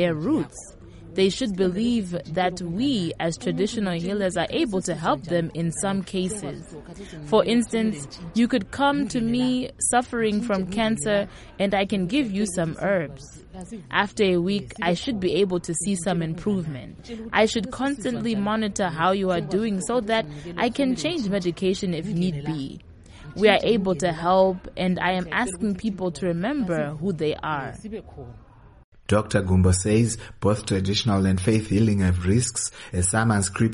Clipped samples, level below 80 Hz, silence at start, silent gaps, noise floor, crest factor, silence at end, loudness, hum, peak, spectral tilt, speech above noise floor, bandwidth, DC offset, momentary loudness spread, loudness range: under 0.1%; -46 dBFS; 0 s; 28.84-28.92 s; -43 dBFS; 20 dB; 0 s; -24 LUFS; none; -4 dBFS; -5 dB/octave; 20 dB; 11.5 kHz; under 0.1%; 12 LU; 3 LU